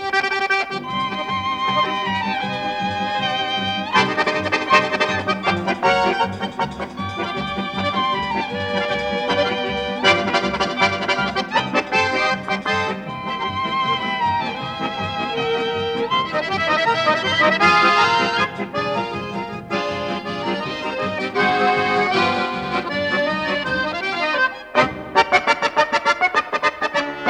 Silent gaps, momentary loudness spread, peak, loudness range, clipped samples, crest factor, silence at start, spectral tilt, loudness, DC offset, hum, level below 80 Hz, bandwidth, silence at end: none; 8 LU; -2 dBFS; 5 LU; under 0.1%; 18 dB; 0 s; -4 dB/octave; -19 LUFS; under 0.1%; none; -52 dBFS; 12 kHz; 0 s